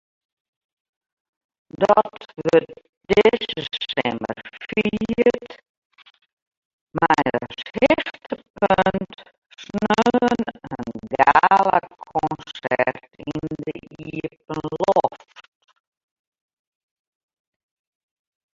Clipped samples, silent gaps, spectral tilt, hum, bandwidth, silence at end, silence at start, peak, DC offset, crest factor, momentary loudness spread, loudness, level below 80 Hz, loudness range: under 0.1%; 2.89-3.01 s, 5.69-5.90 s, 6.33-6.51 s, 6.57-6.87 s, 8.50-8.54 s, 9.38-9.42 s; -6 dB/octave; none; 7.8 kHz; 3.4 s; 1.75 s; -2 dBFS; under 0.1%; 22 dB; 15 LU; -21 LUFS; -54 dBFS; 8 LU